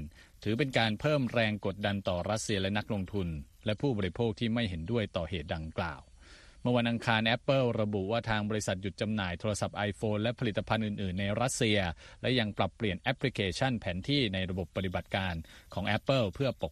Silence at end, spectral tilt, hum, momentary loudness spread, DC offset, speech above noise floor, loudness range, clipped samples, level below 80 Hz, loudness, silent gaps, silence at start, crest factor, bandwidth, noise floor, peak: 0 s; -5.5 dB/octave; none; 8 LU; under 0.1%; 23 dB; 3 LU; under 0.1%; -52 dBFS; -32 LUFS; none; 0 s; 20 dB; 13 kHz; -55 dBFS; -12 dBFS